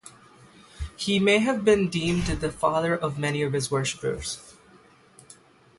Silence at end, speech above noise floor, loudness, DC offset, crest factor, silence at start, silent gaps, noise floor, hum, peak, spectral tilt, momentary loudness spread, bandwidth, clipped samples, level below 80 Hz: 1.3 s; 31 dB; -25 LUFS; under 0.1%; 18 dB; 0.05 s; none; -55 dBFS; none; -8 dBFS; -5 dB/octave; 12 LU; 11.5 kHz; under 0.1%; -44 dBFS